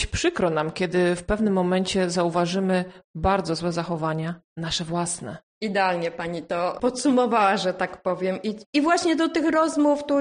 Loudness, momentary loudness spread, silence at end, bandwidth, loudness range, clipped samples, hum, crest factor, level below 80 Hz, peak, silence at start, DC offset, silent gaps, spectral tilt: -24 LUFS; 8 LU; 0 s; 10 kHz; 4 LU; under 0.1%; none; 16 dB; -44 dBFS; -8 dBFS; 0 s; under 0.1%; 3.04-3.14 s, 4.44-4.56 s, 5.43-5.61 s, 8.66-8.73 s; -5 dB/octave